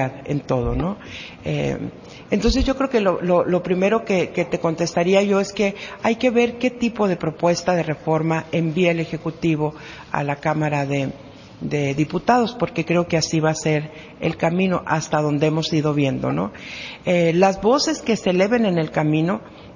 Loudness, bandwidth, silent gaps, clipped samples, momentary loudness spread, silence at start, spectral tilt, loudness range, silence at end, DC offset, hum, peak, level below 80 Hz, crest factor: -21 LUFS; 7.4 kHz; none; under 0.1%; 9 LU; 0 s; -6 dB/octave; 3 LU; 0 s; under 0.1%; none; -2 dBFS; -40 dBFS; 18 dB